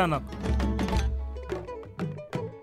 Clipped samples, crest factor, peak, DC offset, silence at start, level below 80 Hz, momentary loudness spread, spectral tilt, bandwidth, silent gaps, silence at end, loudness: under 0.1%; 18 dB; -12 dBFS; under 0.1%; 0 s; -34 dBFS; 8 LU; -6.5 dB/octave; 12.5 kHz; none; 0 s; -31 LUFS